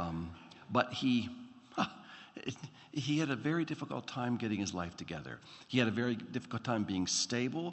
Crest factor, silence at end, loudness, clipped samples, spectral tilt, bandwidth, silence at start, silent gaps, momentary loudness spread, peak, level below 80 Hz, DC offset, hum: 22 dB; 0 s; -36 LUFS; under 0.1%; -4.5 dB/octave; 8.2 kHz; 0 s; none; 14 LU; -14 dBFS; -70 dBFS; under 0.1%; none